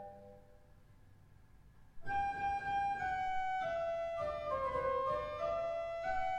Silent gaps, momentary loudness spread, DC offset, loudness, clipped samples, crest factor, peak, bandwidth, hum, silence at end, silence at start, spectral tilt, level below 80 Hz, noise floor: none; 4 LU; under 0.1%; -38 LUFS; under 0.1%; 14 dB; -26 dBFS; 9.6 kHz; none; 0 s; 0 s; -5 dB/octave; -58 dBFS; -61 dBFS